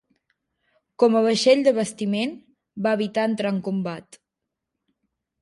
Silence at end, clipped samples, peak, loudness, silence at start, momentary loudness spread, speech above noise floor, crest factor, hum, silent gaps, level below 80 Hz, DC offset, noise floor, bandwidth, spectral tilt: 1.4 s; under 0.1%; -6 dBFS; -22 LUFS; 1 s; 12 LU; 62 dB; 18 dB; none; none; -72 dBFS; under 0.1%; -83 dBFS; 11.5 kHz; -5 dB/octave